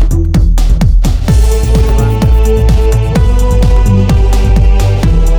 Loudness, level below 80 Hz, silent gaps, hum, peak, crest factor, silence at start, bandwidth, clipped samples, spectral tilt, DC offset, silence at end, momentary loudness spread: -10 LUFS; -8 dBFS; none; none; 0 dBFS; 6 dB; 0 s; 14.5 kHz; under 0.1%; -7 dB/octave; under 0.1%; 0 s; 2 LU